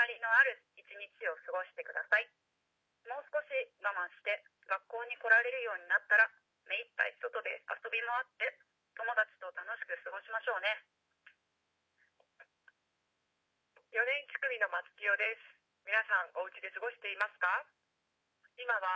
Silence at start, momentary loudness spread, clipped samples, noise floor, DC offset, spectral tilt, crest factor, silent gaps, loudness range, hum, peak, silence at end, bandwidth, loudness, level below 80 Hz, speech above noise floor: 0 s; 14 LU; under 0.1%; -83 dBFS; under 0.1%; -0.5 dB/octave; 22 dB; none; 9 LU; none; -14 dBFS; 0 s; 8 kHz; -34 LUFS; under -90 dBFS; 47 dB